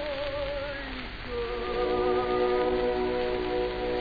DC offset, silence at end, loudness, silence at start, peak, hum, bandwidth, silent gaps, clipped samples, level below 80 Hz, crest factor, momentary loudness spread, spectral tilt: 0.2%; 0 s; -29 LUFS; 0 s; -14 dBFS; none; 5 kHz; none; under 0.1%; -42 dBFS; 14 dB; 9 LU; -7.5 dB/octave